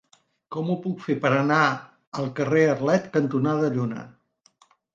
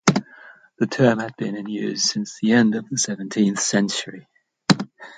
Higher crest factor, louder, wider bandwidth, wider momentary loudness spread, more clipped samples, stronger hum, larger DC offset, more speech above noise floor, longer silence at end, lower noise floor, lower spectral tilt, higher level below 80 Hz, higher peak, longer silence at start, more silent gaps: about the same, 20 dB vs 22 dB; about the same, -23 LUFS vs -21 LUFS; second, 7.6 kHz vs 9.4 kHz; about the same, 12 LU vs 10 LU; neither; neither; neither; first, 38 dB vs 26 dB; first, 0.85 s vs 0.05 s; first, -61 dBFS vs -47 dBFS; first, -7 dB/octave vs -4 dB/octave; second, -68 dBFS vs -62 dBFS; second, -6 dBFS vs 0 dBFS; first, 0.5 s vs 0.05 s; first, 2.07-2.12 s vs none